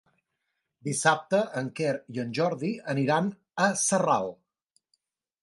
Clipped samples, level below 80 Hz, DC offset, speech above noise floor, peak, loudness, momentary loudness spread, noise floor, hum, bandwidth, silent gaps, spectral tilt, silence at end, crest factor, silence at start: under 0.1%; -74 dBFS; under 0.1%; 54 dB; -8 dBFS; -27 LUFS; 9 LU; -81 dBFS; none; 11.5 kHz; none; -4 dB/octave; 1.1 s; 20 dB; 0.85 s